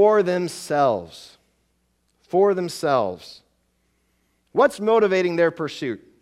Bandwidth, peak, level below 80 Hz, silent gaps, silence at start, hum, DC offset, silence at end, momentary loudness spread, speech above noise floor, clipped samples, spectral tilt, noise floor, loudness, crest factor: 14 kHz; -4 dBFS; -66 dBFS; none; 0 s; none; under 0.1%; 0.25 s; 12 LU; 48 dB; under 0.1%; -5.5 dB/octave; -68 dBFS; -21 LUFS; 18 dB